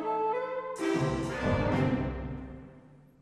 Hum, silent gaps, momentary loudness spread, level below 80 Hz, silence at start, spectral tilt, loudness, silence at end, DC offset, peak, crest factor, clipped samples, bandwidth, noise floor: none; none; 13 LU; -46 dBFS; 0 s; -7 dB/octave; -31 LUFS; 0.25 s; under 0.1%; -16 dBFS; 16 dB; under 0.1%; 13 kHz; -55 dBFS